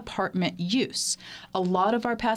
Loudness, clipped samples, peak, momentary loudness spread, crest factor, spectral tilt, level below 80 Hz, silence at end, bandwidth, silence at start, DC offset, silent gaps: -27 LUFS; under 0.1%; -10 dBFS; 6 LU; 16 dB; -4 dB/octave; -58 dBFS; 0 s; 15 kHz; 0 s; under 0.1%; none